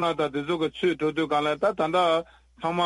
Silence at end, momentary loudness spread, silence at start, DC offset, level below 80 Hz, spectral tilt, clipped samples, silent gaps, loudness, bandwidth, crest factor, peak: 0 s; 5 LU; 0 s; under 0.1%; -60 dBFS; -5.5 dB/octave; under 0.1%; none; -25 LUFS; 11.5 kHz; 14 dB; -12 dBFS